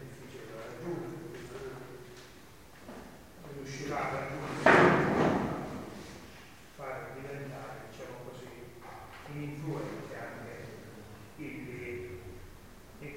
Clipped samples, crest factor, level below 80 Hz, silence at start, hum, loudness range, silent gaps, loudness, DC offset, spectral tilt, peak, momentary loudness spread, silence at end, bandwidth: under 0.1%; 26 dB; -58 dBFS; 0 s; none; 16 LU; none; -33 LUFS; 0.1%; -6 dB/octave; -8 dBFS; 23 LU; 0 s; 16 kHz